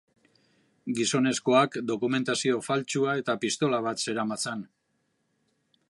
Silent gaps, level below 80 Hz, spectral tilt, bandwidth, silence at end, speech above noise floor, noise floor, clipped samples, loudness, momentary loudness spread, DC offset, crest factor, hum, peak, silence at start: none; -76 dBFS; -4 dB/octave; 11.5 kHz; 1.25 s; 48 dB; -75 dBFS; under 0.1%; -27 LUFS; 9 LU; under 0.1%; 22 dB; none; -8 dBFS; 0.85 s